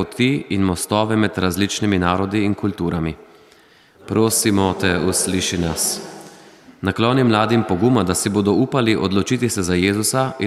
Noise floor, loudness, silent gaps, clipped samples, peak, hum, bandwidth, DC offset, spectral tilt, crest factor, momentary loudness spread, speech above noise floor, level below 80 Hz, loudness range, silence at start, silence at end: -51 dBFS; -18 LUFS; none; under 0.1%; -2 dBFS; none; 15.5 kHz; under 0.1%; -4.5 dB/octave; 18 dB; 7 LU; 33 dB; -46 dBFS; 3 LU; 0 s; 0 s